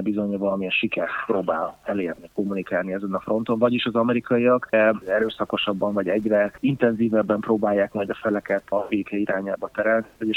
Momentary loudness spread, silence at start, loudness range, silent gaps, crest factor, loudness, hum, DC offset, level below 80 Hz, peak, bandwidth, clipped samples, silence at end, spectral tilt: 7 LU; 0 s; 3 LU; none; 18 dB; -23 LUFS; none; under 0.1%; -60 dBFS; -4 dBFS; 9.8 kHz; under 0.1%; 0 s; -7.5 dB/octave